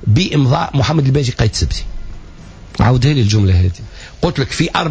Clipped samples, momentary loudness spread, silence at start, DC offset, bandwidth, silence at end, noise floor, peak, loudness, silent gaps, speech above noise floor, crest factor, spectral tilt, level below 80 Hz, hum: under 0.1%; 16 LU; 0 s; under 0.1%; 8 kHz; 0 s; -34 dBFS; -2 dBFS; -15 LUFS; none; 21 dB; 12 dB; -6 dB/octave; -26 dBFS; none